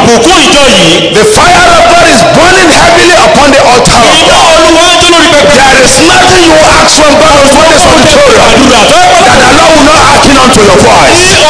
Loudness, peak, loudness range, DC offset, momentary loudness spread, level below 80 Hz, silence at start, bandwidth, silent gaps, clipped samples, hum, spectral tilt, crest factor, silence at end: -1 LUFS; 0 dBFS; 0 LU; 6%; 1 LU; -20 dBFS; 0 s; 11 kHz; none; 50%; none; -2.5 dB/octave; 2 dB; 0 s